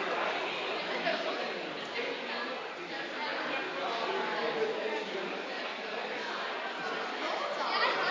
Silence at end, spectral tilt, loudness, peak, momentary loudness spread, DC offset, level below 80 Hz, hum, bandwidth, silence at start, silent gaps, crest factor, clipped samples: 0 s; -3 dB/octave; -34 LUFS; -16 dBFS; 5 LU; under 0.1%; -86 dBFS; none; 7.6 kHz; 0 s; none; 18 dB; under 0.1%